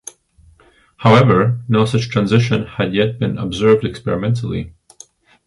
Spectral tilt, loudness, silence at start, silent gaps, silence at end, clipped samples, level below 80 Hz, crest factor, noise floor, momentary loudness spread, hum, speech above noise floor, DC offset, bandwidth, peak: -7 dB/octave; -16 LUFS; 1 s; none; 0.75 s; under 0.1%; -44 dBFS; 16 dB; -51 dBFS; 10 LU; none; 36 dB; under 0.1%; 11.5 kHz; 0 dBFS